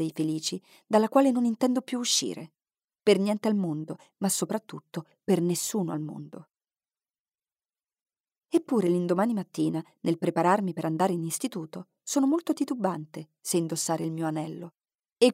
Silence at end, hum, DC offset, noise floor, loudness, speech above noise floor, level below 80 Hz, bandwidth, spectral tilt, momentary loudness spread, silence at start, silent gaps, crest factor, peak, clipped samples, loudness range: 0 s; none; under 0.1%; under -90 dBFS; -27 LUFS; over 62 dB; -80 dBFS; 16 kHz; -5 dB/octave; 15 LU; 0 s; 2.84-2.88 s, 7.20-7.25 s, 8.02-8.06 s, 8.20-8.24 s; 20 dB; -8 dBFS; under 0.1%; 7 LU